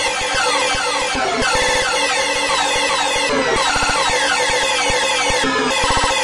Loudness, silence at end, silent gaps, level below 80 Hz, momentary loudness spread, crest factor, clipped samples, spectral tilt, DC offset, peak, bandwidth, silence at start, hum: -16 LUFS; 0 s; none; -36 dBFS; 2 LU; 14 dB; under 0.1%; -1 dB/octave; under 0.1%; -4 dBFS; 11.5 kHz; 0 s; none